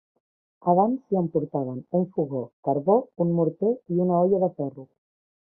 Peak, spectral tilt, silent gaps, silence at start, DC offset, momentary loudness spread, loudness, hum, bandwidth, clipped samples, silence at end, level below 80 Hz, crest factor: -6 dBFS; -15.5 dB/octave; 2.53-2.63 s; 0.65 s; under 0.1%; 9 LU; -25 LUFS; none; 1.6 kHz; under 0.1%; 0.7 s; -68 dBFS; 18 dB